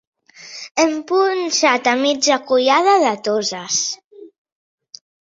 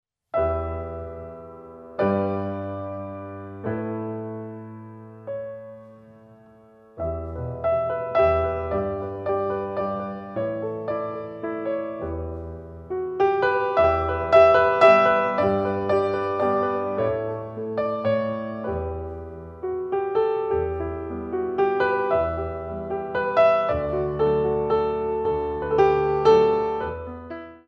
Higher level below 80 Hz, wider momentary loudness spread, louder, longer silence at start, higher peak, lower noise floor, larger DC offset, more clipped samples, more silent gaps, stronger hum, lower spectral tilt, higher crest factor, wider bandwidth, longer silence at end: second, -68 dBFS vs -44 dBFS; second, 11 LU vs 17 LU; first, -16 LUFS vs -23 LUFS; about the same, 0.4 s vs 0.35 s; about the same, -2 dBFS vs -2 dBFS; second, -38 dBFS vs -51 dBFS; neither; neither; first, 0.71-0.75 s, 4.04-4.11 s vs none; neither; second, -1.5 dB/octave vs -8 dB/octave; about the same, 18 dB vs 20 dB; about the same, 7.8 kHz vs 7.4 kHz; first, 0.95 s vs 0.1 s